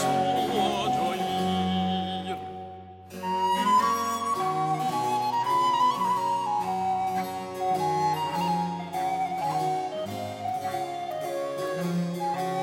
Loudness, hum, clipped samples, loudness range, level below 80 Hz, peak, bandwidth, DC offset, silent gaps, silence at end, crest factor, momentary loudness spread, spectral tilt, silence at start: -27 LUFS; none; under 0.1%; 5 LU; -66 dBFS; -12 dBFS; 16 kHz; under 0.1%; none; 0 s; 16 dB; 9 LU; -5 dB/octave; 0 s